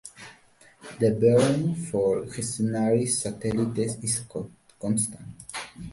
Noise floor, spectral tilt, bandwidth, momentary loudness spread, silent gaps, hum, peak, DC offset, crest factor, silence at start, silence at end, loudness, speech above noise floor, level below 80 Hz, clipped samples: -56 dBFS; -5.5 dB/octave; 11.5 kHz; 20 LU; none; none; -8 dBFS; under 0.1%; 18 dB; 0.05 s; 0 s; -25 LUFS; 31 dB; -56 dBFS; under 0.1%